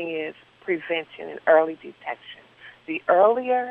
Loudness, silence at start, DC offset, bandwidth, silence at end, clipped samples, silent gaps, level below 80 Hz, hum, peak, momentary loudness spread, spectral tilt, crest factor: -22 LUFS; 0 s; under 0.1%; 4.2 kHz; 0 s; under 0.1%; none; -74 dBFS; none; -6 dBFS; 20 LU; -7 dB/octave; 18 dB